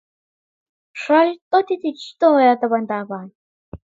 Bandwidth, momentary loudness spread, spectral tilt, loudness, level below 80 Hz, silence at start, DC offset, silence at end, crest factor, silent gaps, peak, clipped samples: 7.8 kHz; 17 LU; -6 dB/octave; -18 LUFS; -56 dBFS; 0.95 s; under 0.1%; 0.2 s; 16 dB; 1.41-1.51 s, 3.35-3.72 s; -2 dBFS; under 0.1%